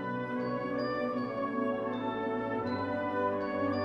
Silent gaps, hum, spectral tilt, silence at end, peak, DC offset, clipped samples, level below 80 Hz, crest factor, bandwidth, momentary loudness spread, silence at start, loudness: none; none; -8 dB/octave; 0 s; -20 dBFS; under 0.1%; under 0.1%; -66 dBFS; 14 dB; 6.2 kHz; 2 LU; 0 s; -33 LUFS